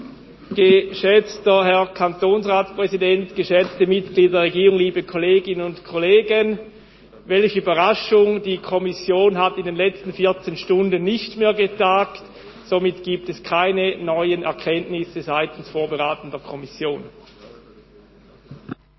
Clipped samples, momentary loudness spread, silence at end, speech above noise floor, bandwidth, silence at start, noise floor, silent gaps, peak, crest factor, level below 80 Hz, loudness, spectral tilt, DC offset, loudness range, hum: under 0.1%; 11 LU; 0.25 s; 30 dB; 6 kHz; 0 s; -49 dBFS; none; -2 dBFS; 18 dB; -56 dBFS; -19 LUFS; -6.5 dB/octave; under 0.1%; 7 LU; none